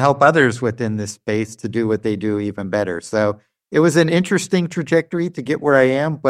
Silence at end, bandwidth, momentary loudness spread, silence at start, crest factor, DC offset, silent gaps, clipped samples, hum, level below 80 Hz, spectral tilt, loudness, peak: 0 s; 14 kHz; 9 LU; 0 s; 16 dB; under 0.1%; none; under 0.1%; none; -58 dBFS; -6 dB/octave; -18 LUFS; -2 dBFS